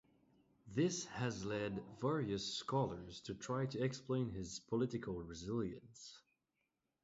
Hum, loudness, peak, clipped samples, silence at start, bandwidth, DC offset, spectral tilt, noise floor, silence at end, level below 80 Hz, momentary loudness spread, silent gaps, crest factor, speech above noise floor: none; -42 LUFS; -24 dBFS; under 0.1%; 0.65 s; 7.6 kHz; under 0.1%; -5.5 dB/octave; -87 dBFS; 0.85 s; -66 dBFS; 10 LU; none; 18 dB; 46 dB